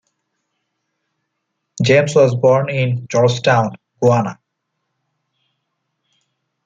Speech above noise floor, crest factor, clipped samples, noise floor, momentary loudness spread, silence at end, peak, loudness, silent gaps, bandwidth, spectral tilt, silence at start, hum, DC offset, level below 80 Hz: 60 dB; 16 dB; under 0.1%; -74 dBFS; 7 LU; 2.35 s; -2 dBFS; -15 LUFS; none; 9.2 kHz; -6 dB/octave; 1.75 s; none; under 0.1%; -60 dBFS